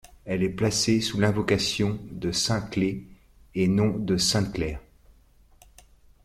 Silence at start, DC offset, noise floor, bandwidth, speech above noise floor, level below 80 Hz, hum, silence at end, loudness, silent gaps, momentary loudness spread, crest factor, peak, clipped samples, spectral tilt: 0.25 s; under 0.1%; -57 dBFS; 14.5 kHz; 32 dB; -48 dBFS; none; 1.45 s; -25 LUFS; none; 9 LU; 18 dB; -8 dBFS; under 0.1%; -4.5 dB/octave